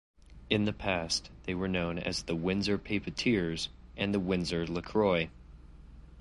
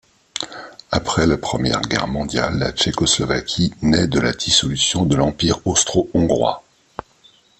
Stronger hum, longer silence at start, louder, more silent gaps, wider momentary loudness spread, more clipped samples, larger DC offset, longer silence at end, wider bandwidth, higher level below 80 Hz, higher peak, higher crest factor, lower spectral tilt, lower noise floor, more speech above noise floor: neither; about the same, 0.3 s vs 0.35 s; second, -32 LUFS vs -18 LUFS; neither; second, 6 LU vs 14 LU; neither; neither; second, 0 s vs 1 s; first, 11.5 kHz vs 8.8 kHz; second, -50 dBFS vs -40 dBFS; second, -12 dBFS vs -2 dBFS; about the same, 20 dB vs 18 dB; about the same, -5 dB/octave vs -4 dB/octave; about the same, -51 dBFS vs -53 dBFS; second, 20 dB vs 35 dB